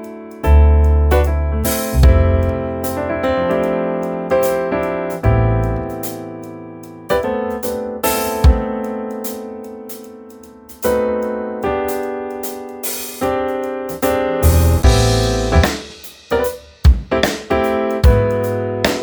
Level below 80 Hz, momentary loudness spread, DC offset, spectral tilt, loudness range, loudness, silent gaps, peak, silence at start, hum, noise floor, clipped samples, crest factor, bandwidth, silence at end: -20 dBFS; 15 LU; under 0.1%; -6 dB/octave; 6 LU; -17 LUFS; none; 0 dBFS; 0 s; none; -38 dBFS; under 0.1%; 16 dB; over 20 kHz; 0 s